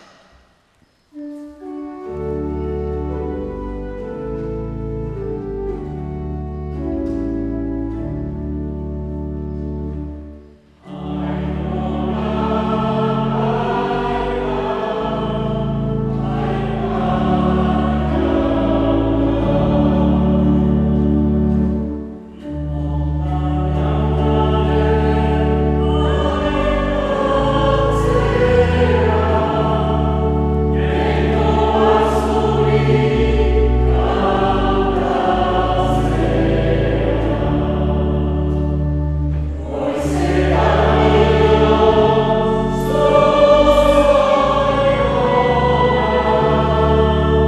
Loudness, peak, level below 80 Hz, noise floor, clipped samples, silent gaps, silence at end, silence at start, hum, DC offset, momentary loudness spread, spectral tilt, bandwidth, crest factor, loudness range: -17 LUFS; 0 dBFS; -24 dBFS; -57 dBFS; under 0.1%; none; 0 s; 1.15 s; none; under 0.1%; 13 LU; -8 dB/octave; 11 kHz; 16 dB; 12 LU